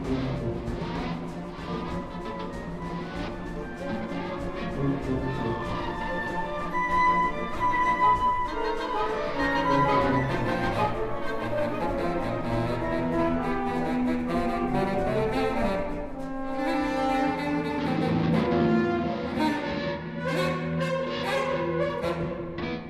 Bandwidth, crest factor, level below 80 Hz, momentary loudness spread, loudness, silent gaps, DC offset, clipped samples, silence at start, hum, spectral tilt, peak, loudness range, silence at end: 14.5 kHz; 16 dB; -42 dBFS; 11 LU; -28 LUFS; none; under 0.1%; under 0.1%; 0 s; none; -7 dB/octave; -12 dBFS; 8 LU; 0 s